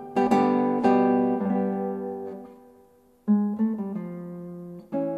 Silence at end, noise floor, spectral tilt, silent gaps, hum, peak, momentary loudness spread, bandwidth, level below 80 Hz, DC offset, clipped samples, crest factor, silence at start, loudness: 0 s; -57 dBFS; -8.5 dB/octave; none; none; -8 dBFS; 17 LU; 8.4 kHz; -68 dBFS; under 0.1%; under 0.1%; 18 dB; 0 s; -25 LUFS